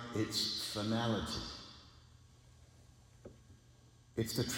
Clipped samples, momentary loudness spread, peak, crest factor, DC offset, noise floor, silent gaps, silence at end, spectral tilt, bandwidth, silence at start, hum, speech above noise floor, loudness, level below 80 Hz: under 0.1%; 23 LU; -22 dBFS; 18 dB; under 0.1%; -63 dBFS; none; 0 s; -4 dB/octave; 17.5 kHz; 0 s; none; 26 dB; -37 LUFS; -62 dBFS